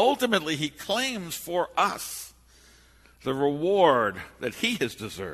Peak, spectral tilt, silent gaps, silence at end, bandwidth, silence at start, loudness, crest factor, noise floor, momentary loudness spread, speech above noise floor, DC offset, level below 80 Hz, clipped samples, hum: -6 dBFS; -3.5 dB/octave; none; 0 s; 13.5 kHz; 0 s; -26 LUFS; 22 dB; -56 dBFS; 14 LU; 30 dB; under 0.1%; -60 dBFS; under 0.1%; none